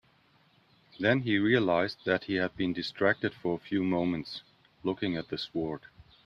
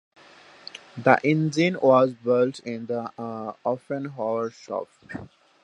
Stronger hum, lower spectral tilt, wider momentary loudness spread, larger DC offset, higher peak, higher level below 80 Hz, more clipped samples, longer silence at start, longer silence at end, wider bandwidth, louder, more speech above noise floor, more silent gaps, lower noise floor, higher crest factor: neither; about the same, -7.5 dB/octave vs -6.5 dB/octave; second, 11 LU vs 20 LU; neither; second, -10 dBFS vs -2 dBFS; about the same, -64 dBFS vs -68 dBFS; neither; first, 1 s vs 0.75 s; about the same, 0.45 s vs 0.4 s; second, 7.4 kHz vs 10 kHz; second, -30 LUFS vs -24 LUFS; first, 36 dB vs 27 dB; neither; first, -65 dBFS vs -51 dBFS; about the same, 20 dB vs 24 dB